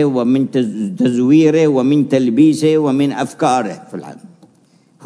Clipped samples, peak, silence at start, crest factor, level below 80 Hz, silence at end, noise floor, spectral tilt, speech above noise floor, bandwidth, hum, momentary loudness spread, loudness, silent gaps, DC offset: under 0.1%; -2 dBFS; 0 s; 14 dB; -66 dBFS; 0 s; -52 dBFS; -7 dB/octave; 38 dB; 11 kHz; none; 10 LU; -14 LUFS; none; under 0.1%